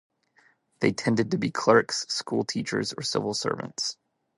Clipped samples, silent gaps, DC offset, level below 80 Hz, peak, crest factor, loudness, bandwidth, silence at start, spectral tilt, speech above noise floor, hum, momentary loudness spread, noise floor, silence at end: under 0.1%; none; under 0.1%; -66 dBFS; -6 dBFS; 22 dB; -26 LUFS; 11.5 kHz; 0.8 s; -4 dB/octave; 38 dB; none; 9 LU; -64 dBFS; 0.45 s